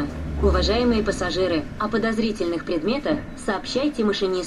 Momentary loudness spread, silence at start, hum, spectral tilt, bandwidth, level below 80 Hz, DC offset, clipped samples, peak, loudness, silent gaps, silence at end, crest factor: 7 LU; 0 s; none; -5.5 dB/octave; 12 kHz; -34 dBFS; under 0.1%; under 0.1%; -8 dBFS; -23 LUFS; none; 0 s; 16 dB